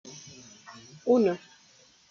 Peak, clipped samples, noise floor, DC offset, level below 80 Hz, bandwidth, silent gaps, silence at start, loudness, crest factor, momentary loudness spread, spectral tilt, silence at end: -12 dBFS; under 0.1%; -59 dBFS; under 0.1%; -76 dBFS; 7.4 kHz; none; 0.05 s; -26 LUFS; 20 dB; 24 LU; -6 dB/octave; 0.75 s